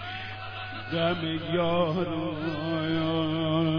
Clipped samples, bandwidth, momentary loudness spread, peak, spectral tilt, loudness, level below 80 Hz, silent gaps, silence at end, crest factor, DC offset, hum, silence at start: under 0.1%; 5.4 kHz; 10 LU; -14 dBFS; -8.5 dB/octave; -29 LUFS; -56 dBFS; none; 0 s; 14 dB; under 0.1%; none; 0 s